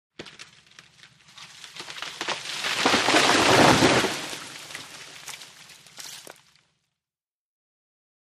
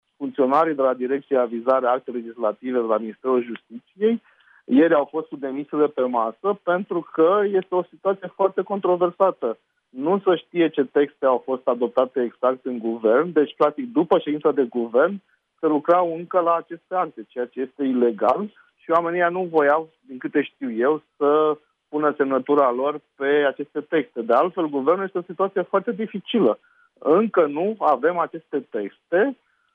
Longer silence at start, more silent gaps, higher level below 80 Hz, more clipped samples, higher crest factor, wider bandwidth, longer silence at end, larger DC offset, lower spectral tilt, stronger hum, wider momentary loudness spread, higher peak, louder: about the same, 0.2 s vs 0.2 s; neither; first, -56 dBFS vs -76 dBFS; neither; first, 22 dB vs 16 dB; first, 15.5 kHz vs 4.7 kHz; first, 2.1 s vs 0.4 s; neither; second, -3 dB/octave vs -8.5 dB/octave; neither; first, 26 LU vs 10 LU; about the same, -4 dBFS vs -6 dBFS; about the same, -20 LUFS vs -22 LUFS